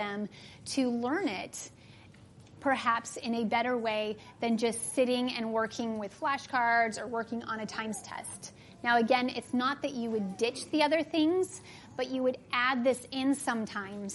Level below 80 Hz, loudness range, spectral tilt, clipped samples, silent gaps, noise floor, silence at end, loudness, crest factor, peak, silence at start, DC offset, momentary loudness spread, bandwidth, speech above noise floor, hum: -72 dBFS; 3 LU; -3.5 dB/octave; under 0.1%; none; -54 dBFS; 0 s; -31 LUFS; 20 dB; -12 dBFS; 0 s; under 0.1%; 11 LU; 11.5 kHz; 23 dB; none